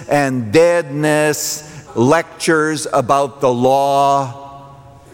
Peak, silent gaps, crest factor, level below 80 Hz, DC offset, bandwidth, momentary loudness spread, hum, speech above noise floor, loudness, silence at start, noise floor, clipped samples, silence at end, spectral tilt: -2 dBFS; none; 14 dB; -54 dBFS; under 0.1%; 17 kHz; 8 LU; none; 25 dB; -15 LUFS; 0 s; -39 dBFS; under 0.1%; 0.4 s; -4.5 dB/octave